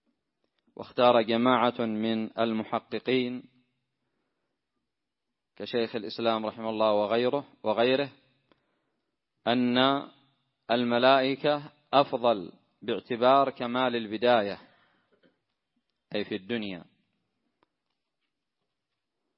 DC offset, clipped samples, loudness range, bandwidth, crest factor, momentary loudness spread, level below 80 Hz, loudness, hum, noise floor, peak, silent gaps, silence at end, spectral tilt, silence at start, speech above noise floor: under 0.1%; under 0.1%; 13 LU; 5.8 kHz; 22 dB; 13 LU; -76 dBFS; -27 LUFS; none; -87 dBFS; -6 dBFS; none; 2.55 s; -9 dB/octave; 0.8 s; 60 dB